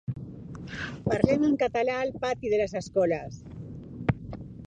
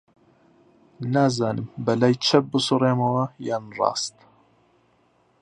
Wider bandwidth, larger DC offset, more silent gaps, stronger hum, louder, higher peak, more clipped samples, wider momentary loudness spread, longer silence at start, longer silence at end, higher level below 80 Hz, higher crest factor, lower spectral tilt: second, 9.6 kHz vs 11 kHz; neither; neither; neither; second, -28 LUFS vs -23 LUFS; about the same, -4 dBFS vs -2 dBFS; neither; first, 18 LU vs 10 LU; second, 0.1 s vs 1 s; second, 0 s vs 1.35 s; first, -50 dBFS vs -64 dBFS; about the same, 24 dB vs 22 dB; first, -7 dB/octave vs -5.5 dB/octave